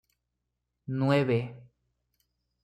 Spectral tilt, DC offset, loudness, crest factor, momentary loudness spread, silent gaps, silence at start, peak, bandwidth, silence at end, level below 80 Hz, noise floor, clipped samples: -8 dB/octave; under 0.1%; -28 LUFS; 20 dB; 17 LU; none; 0.9 s; -12 dBFS; 10 kHz; 1 s; -68 dBFS; -83 dBFS; under 0.1%